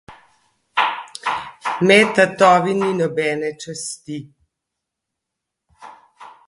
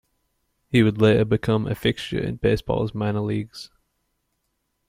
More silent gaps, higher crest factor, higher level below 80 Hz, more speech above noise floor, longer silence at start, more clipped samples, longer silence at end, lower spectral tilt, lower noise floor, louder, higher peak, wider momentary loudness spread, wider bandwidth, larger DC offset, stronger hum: neither; about the same, 20 dB vs 18 dB; second, -62 dBFS vs -46 dBFS; first, 65 dB vs 53 dB; second, 0.1 s vs 0.7 s; neither; second, 0.2 s vs 1.25 s; second, -4.5 dB/octave vs -7.5 dB/octave; first, -81 dBFS vs -74 dBFS; first, -18 LUFS vs -22 LUFS; first, 0 dBFS vs -4 dBFS; first, 16 LU vs 11 LU; second, 11.5 kHz vs 15.5 kHz; neither; neither